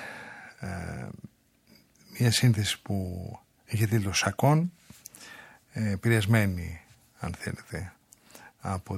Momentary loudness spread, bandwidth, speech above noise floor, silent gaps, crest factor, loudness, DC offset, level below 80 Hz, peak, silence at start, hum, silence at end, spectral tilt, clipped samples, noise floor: 23 LU; 15.5 kHz; 34 dB; none; 22 dB; -28 LUFS; under 0.1%; -54 dBFS; -8 dBFS; 0 s; none; 0 s; -5 dB/octave; under 0.1%; -61 dBFS